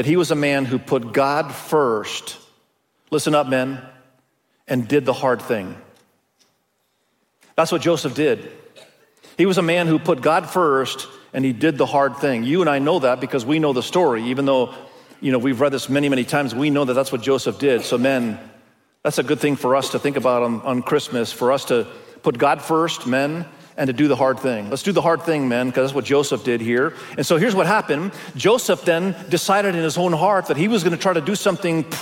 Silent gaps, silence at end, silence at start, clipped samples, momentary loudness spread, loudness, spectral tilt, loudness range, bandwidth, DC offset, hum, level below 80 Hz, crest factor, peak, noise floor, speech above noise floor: none; 0 s; 0 s; under 0.1%; 8 LU; -20 LUFS; -5 dB/octave; 5 LU; 17 kHz; under 0.1%; none; -66 dBFS; 16 dB; -4 dBFS; -68 dBFS; 49 dB